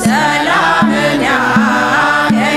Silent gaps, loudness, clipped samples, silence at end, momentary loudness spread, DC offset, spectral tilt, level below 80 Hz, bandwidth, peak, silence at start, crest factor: none; -11 LUFS; under 0.1%; 0 s; 1 LU; under 0.1%; -4.5 dB/octave; -42 dBFS; 14.5 kHz; 0 dBFS; 0 s; 10 dB